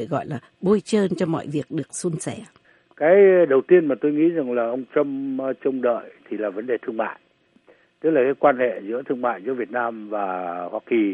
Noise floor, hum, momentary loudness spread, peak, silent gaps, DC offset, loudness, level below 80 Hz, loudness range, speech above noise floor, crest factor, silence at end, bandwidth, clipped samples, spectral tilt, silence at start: -57 dBFS; none; 12 LU; -4 dBFS; none; under 0.1%; -22 LUFS; -68 dBFS; 6 LU; 35 dB; 18 dB; 0 s; 11 kHz; under 0.1%; -6.5 dB/octave; 0 s